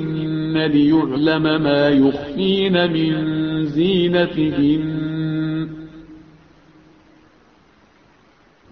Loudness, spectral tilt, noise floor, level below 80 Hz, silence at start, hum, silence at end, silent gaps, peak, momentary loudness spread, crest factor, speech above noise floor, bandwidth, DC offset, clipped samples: -18 LUFS; -9 dB/octave; -53 dBFS; -48 dBFS; 0 s; none; 2.55 s; none; -4 dBFS; 8 LU; 14 dB; 37 dB; 5.8 kHz; under 0.1%; under 0.1%